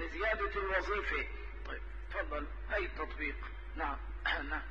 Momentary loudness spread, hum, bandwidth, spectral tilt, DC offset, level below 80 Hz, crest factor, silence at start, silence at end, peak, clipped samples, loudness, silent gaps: 11 LU; none; 7.2 kHz; -6 dB/octave; 0.2%; -44 dBFS; 18 dB; 0 s; 0 s; -20 dBFS; under 0.1%; -38 LUFS; none